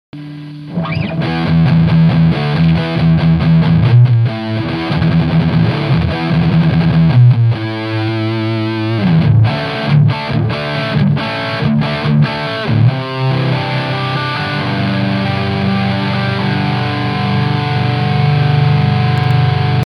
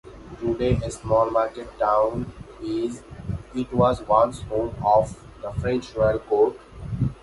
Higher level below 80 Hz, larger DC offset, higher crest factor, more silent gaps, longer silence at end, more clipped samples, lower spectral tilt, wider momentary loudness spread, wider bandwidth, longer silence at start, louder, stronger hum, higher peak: first, -34 dBFS vs -40 dBFS; neither; second, 12 dB vs 18 dB; neither; about the same, 0 s vs 0.1 s; neither; about the same, -8.5 dB/octave vs -7.5 dB/octave; second, 7 LU vs 14 LU; second, 6 kHz vs 11.5 kHz; about the same, 0.15 s vs 0.05 s; first, -13 LUFS vs -24 LUFS; neither; about the same, -2 dBFS vs -4 dBFS